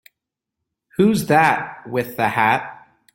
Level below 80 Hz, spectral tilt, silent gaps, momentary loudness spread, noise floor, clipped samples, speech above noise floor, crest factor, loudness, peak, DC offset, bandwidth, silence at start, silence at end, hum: -56 dBFS; -5.5 dB/octave; none; 10 LU; -83 dBFS; under 0.1%; 65 dB; 18 dB; -18 LUFS; -2 dBFS; under 0.1%; 17 kHz; 1 s; 0.4 s; none